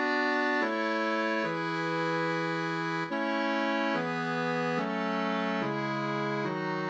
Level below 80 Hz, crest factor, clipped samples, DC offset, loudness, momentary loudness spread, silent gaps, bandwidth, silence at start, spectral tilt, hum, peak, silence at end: -82 dBFS; 14 dB; under 0.1%; under 0.1%; -30 LUFS; 4 LU; none; 8.8 kHz; 0 s; -6 dB/octave; none; -16 dBFS; 0 s